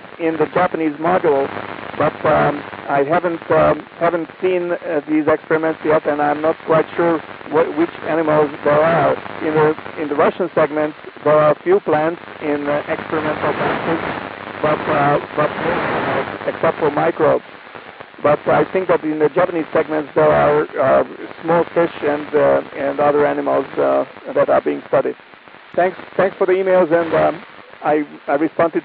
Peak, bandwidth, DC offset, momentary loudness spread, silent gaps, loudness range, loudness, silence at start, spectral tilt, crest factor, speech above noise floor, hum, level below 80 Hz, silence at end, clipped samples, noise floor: -2 dBFS; 4.9 kHz; under 0.1%; 7 LU; none; 2 LU; -17 LUFS; 0 s; -11.5 dB/octave; 14 dB; 19 dB; none; -52 dBFS; 0 s; under 0.1%; -36 dBFS